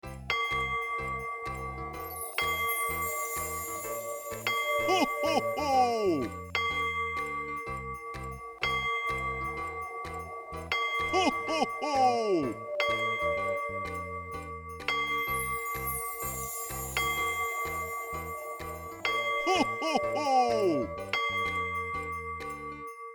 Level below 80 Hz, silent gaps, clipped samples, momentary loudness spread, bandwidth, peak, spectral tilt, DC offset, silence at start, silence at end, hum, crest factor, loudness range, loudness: -52 dBFS; none; under 0.1%; 11 LU; over 20 kHz; -14 dBFS; -3 dB/octave; under 0.1%; 0.05 s; 0 s; none; 18 dB; 4 LU; -31 LUFS